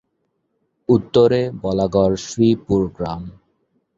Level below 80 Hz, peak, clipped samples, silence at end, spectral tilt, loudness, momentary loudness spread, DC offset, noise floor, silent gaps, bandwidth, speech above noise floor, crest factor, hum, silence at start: -44 dBFS; -2 dBFS; under 0.1%; 0.65 s; -7 dB/octave; -18 LUFS; 14 LU; under 0.1%; -71 dBFS; none; 7.8 kHz; 53 dB; 18 dB; none; 0.9 s